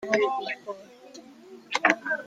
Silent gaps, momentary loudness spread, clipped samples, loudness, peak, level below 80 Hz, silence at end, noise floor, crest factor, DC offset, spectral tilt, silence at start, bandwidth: none; 24 LU; under 0.1%; -26 LUFS; -4 dBFS; -74 dBFS; 0 s; -49 dBFS; 26 dB; under 0.1%; -3 dB/octave; 0 s; 9.8 kHz